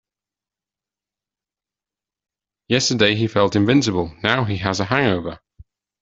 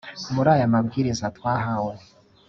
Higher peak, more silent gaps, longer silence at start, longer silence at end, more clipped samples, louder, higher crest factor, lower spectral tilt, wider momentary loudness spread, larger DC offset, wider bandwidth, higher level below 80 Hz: about the same, -2 dBFS vs -4 dBFS; neither; first, 2.7 s vs 0.05 s; first, 0.65 s vs 0.5 s; neither; first, -19 LUFS vs -23 LUFS; about the same, 20 dB vs 20 dB; second, -4.5 dB/octave vs -6.5 dB/octave; second, 6 LU vs 9 LU; neither; about the same, 8 kHz vs 7.6 kHz; about the same, -52 dBFS vs -54 dBFS